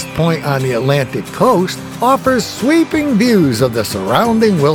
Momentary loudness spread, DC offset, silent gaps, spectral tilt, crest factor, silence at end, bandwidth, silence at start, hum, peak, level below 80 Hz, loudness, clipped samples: 5 LU; under 0.1%; none; -6 dB/octave; 12 dB; 0 s; over 20 kHz; 0 s; none; 0 dBFS; -44 dBFS; -14 LUFS; under 0.1%